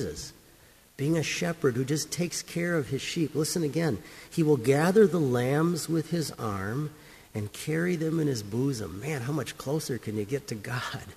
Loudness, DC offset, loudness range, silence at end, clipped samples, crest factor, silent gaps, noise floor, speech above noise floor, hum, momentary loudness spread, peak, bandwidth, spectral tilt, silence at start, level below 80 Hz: -29 LUFS; under 0.1%; 5 LU; 0 s; under 0.1%; 20 dB; none; -57 dBFS; 29 dB; none; 11 LU; -10 dBFS; 15.5 kHz; -5.5 dB/octave; 0 s; -58 dBFS